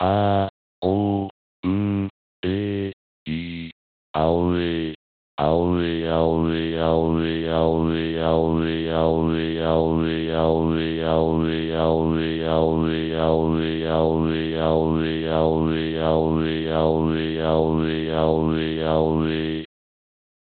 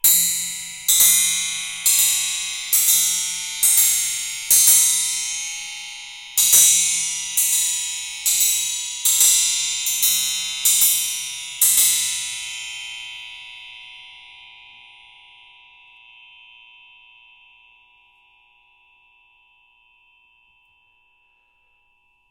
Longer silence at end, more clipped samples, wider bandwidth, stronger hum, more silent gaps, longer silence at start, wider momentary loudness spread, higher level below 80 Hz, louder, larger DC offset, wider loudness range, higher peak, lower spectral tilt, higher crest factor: second, 0.75 s vs 7.8 s; neither; second, 4.5 kHz vs 16.5 kHz; neither; first, 0.50-0.82 s, 1.30-1.63 s, 2.10-2.43 s, 2.93-3.26 s, 3.72-4.14 s, 4.95-5.38 s vs none; about the same, 0 s vs 0.05 s; second, 8 LU vs 18 LU; first, -40 dBFS vs -62 dBFS; second, -22 LUFS vs -16 LUFS; neither; second, 4 LU vs 7 LU; second, -6 dBFS vs 0 dBFS; first, -6 dB/octave vs 4 dB/octave; second, 16 dB vs 22 dB